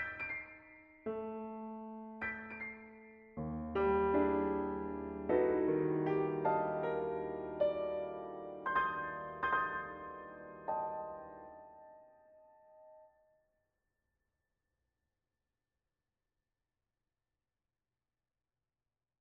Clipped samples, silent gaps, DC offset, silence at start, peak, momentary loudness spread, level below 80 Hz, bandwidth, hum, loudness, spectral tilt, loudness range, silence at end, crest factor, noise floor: under 0.1%; none; under 0.1%; 0 s; -20 dBFS; 19 LU; -64 dBFS; 5 kHz; none; -37 LUFS; -5.5 dB/octave; 12 LU; 6.15 s; 20 dB; under -90 dBFS